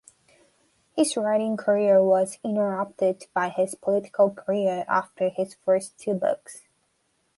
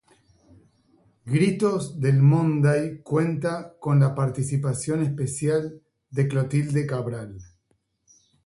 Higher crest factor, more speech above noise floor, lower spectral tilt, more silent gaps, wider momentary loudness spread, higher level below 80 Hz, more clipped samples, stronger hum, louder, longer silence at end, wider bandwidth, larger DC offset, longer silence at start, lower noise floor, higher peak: about the same, 18 dB vs 16 dB; about the same, 47 dB vs 48 dB; second, -5 dB/octave vs -7.5 dB/octave; neither; about the same, 8 LU vs 10 LU; second, -74 dBFS vs -58 dBFS; neither; neither; about the same, -24 LUFS vs -24 LUFS; second, 0.8 s vs 1 s; about the same, 11.5 kHz vs 11.5 kHz; neither; second, 0.95 s vs 1.25 s; about the same, -71 dBFS vs -71 dBFS; about the same, -8 dBFS vs -8 dBFS